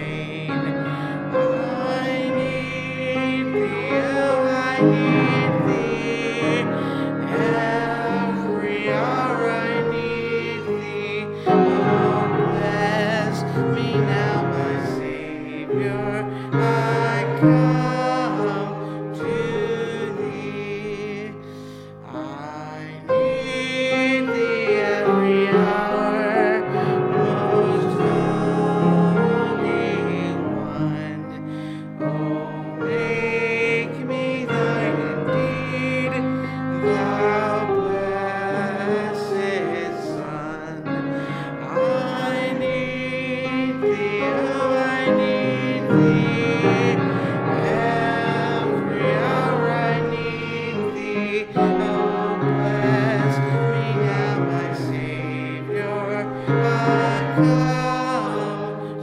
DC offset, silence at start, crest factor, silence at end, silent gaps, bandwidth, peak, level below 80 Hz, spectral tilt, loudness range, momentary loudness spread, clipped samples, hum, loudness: under 0.1%; 0 s; 18 dB; 0 s; none; 11.5 kHz; -4 dBFS; -54 dBFS; -7 dB/octave; 5 LU; 10 LU; under 0.1%; none; -21 LUFS